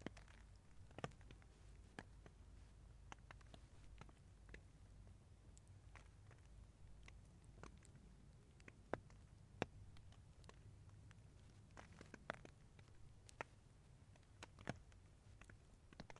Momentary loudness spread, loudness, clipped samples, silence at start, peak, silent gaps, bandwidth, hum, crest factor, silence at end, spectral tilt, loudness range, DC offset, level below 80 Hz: 13 LU; -61 LUFS; under 0.1%; 0 s; -22 dBFS; none; 11 kHz; none; 38 dB; 0 s; -5.5 dB/octave; 7 LU; under 0.1%; -68 dBFS